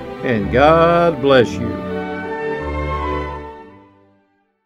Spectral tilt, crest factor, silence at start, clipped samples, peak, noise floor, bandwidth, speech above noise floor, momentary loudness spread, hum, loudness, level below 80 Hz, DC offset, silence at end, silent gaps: -7 dB/octave; 18 dB; 0 s; under 0.1%; 0 dBFS; -61 dBFS; 11 kHz; 47 dB; 13 LU; none; -17 LUFS; -34 dBFS; under 0.1%; 0.95 s; none